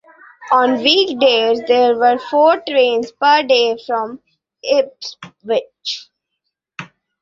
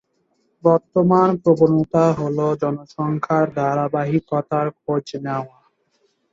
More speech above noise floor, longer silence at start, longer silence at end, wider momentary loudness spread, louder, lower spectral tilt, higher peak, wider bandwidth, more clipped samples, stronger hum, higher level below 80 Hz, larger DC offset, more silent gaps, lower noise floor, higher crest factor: first, 61 dB vs 48 dB; second, 0.4 s vs 0.65 s; second, 0.35 s vs 0.85 s; first, 18 LU vs 10 LU; first, -15 LUFS vs -19 LUFS; second, -3 dB/octave vs -9 dB/octave; about the same, 0 dBFS vs -2 dBFS; about the same, 7.4 kHz vs 7.6 kHz; neither; neither; second, -64 dBFS vs -58 dBFS; neither; neither; first, -76 dBFS vs -66 dBFS; about the same, 16 dB vs 18 dB